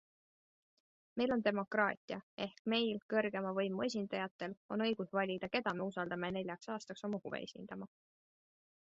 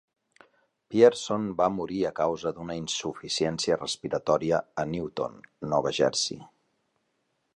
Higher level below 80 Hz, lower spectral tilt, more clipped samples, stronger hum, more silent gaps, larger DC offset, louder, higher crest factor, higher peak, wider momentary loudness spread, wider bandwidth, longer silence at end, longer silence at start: second, -76 dBFS vs -60 dBFS; about the same, -3.5 dB/octave vs -4 dB/octave; neither; neither; first, 1.97-2.08 s, 2.23-2.37 s, 2.59-2.65 s, 3.02-3.09 s, 4.31-4.39 s, 4.57-4.69 s vs none; neither; second, -39 LUFS vs -27 LUFS; about the same, 22 dB vs 22 dB; second, -18 dBFS vs -6 dBFS; about the same, 11 LU vs 12 LU; second, 7.6 kHz vs 11 kHz; about the same, 1.05 s vs 1.1 s; first, 1.15 s vs 0.9 s